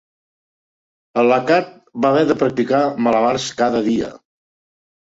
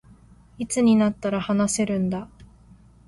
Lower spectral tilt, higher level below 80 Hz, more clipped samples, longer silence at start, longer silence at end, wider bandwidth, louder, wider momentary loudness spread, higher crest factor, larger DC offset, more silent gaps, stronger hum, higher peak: about the same, -5.5 dB/octave vs -5.5 dB/octave; about the same, -56 dBFS vs -52 dBFS; neither; first, 1.15 s vs 0.6 s; first, 0.85 s vs 0.65 s; second, 8 kHz vs 11.5 kHz; first, -17 LUFS vs -22 LUFS; second, 7 LU vs 14 LU; about the same, 16 dB vs 16 dB; neither; neither; neither; first, -2 dBFS vs -8 dBFS